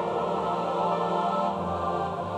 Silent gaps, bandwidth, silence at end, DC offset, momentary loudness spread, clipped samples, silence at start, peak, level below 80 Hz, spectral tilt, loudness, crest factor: none; 11.5 kHz; 0 s; under 0.1%; 3 LU; under 0.1%; 0 s; -14 dBFS; -56 dBFS; -7 dB/octave; -28 LUFS; 14 dB